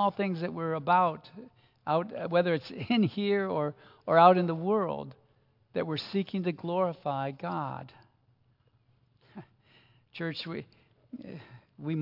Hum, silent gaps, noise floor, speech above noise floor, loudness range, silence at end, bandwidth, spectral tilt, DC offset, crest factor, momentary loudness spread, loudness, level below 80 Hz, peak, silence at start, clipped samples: none; none; -68 dBFS; 39 dB; 16 LU; 0 s; 5.8 kHz; -8.5 dB/octave; under 0.1%; 24 dB; 21 LU; -29 LUFS; -76 dBFS; -8 dBFS; 0 s; under 0.1%